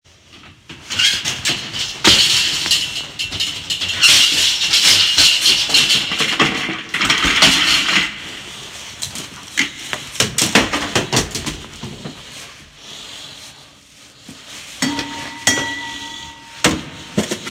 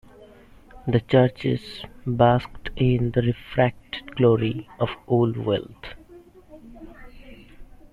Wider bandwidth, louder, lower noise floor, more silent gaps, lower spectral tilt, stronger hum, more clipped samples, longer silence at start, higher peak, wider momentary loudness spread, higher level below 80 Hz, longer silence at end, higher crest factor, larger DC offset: first, 16.5 kHz vs 5 kHz; first, -14 LUFS vs -23 LUFS; second, -44 dBFS vs -49 dBFS; neither; second, -1 dB/octave vs -9 dB/octave; neither; neither; first, 0.35 s vs 0.2 s; first, 0 dBFS vs -4 dBFS; first, 22 LU vs 19 LU; about the same, -44 dBFS vs -44 dBFS; second, 0 s vs 0.3 s; about the same, 18 dB vs 20 dB; neither